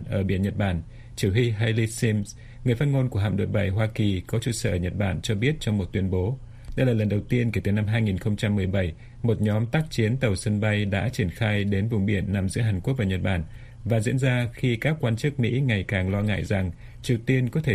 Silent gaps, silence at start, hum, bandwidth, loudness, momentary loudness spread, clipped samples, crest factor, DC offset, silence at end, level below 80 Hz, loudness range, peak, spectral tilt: none; 0 s; none; 14 kHz; -25 LUFS; 5 LU; under 0.1%; 16 dB; under 0.1%; 0 s; -44 dBFS; 1 LU; -8 dBFS; -6.5 dB/octave